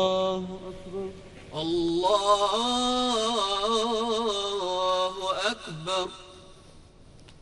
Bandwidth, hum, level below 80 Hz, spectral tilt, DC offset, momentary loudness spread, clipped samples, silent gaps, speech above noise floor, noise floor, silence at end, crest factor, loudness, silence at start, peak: 11.5 kHz; none; -54 dBFS; -3.5 dB/octave; under 0.1%; 15 LU; under 0.1%; none; 24 dB; -51 dBFS; 0.05 s; 18 dB; -26 LUFS; 0 s; -10 dBFS